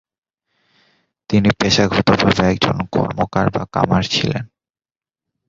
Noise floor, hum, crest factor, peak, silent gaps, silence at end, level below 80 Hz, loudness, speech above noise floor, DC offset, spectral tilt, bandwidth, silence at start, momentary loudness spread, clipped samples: under -90 dBFS; none; 18 dB; 0 dBFS; none; 1 s; -40 dBFS; -17 LUFS; over 74 dB; under 0.1%; -5.5 dB/octave; 7.8 kHz; 1.3 s; 6 LU; under 0.1%